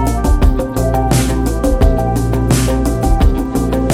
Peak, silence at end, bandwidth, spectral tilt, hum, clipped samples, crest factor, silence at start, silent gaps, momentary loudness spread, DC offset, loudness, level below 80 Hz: 0 dBFS; 0 s; 16 kHz; -6.5 dB/octave; none; under 0.1%; 12 dB; 0 s; none; 3 LU; under 0.1%; -15 LUFS; -16 dBFS